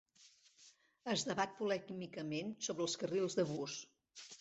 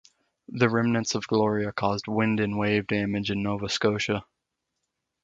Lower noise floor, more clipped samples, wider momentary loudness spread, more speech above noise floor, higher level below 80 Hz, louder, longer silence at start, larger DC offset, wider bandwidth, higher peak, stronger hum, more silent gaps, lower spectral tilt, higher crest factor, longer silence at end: second, -68 dBFS vs -82 dBFS; neither; first, 13 LU vs 4 LU; second, 28 dB vs 57 dB; second, -80 dBFS vs -56 dBFS; second, -40 LUFS vs -26 LUFS; second, 0.2 s vs 0.5 s; neither; about the same, 8.2 kHz vs 7.8 kHz; second, -20 dBFS vs -6 dBFS; neither; neither; second, -4 dB/octave vs -5.5 dB/octave; about the same, 20 dB vs 22 dB; second, 0.05 s vs 1 s